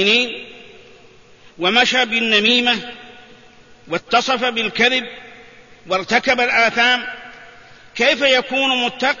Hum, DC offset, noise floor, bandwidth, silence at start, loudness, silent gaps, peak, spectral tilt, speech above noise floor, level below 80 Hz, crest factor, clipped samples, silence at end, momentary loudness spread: none; 0.3%; -47 dBFS; 7.4 kHz; 0 s; -16 LUFS; none; -2 dBFS; -2.5 dB/octave; 30 dB; -56 dBFS; 18 dB; under 0.1%; 0 s; 19 LU